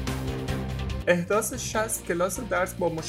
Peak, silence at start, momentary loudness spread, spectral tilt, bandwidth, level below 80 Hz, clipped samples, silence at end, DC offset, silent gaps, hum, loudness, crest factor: -8 dBFS; 0 s; 7 LU; -4.5 dB/octave; 16 kHz; -40 dBFS; under 0.1%; 0 s; under 0.1%; none; none; -27 LUFS; 20 dB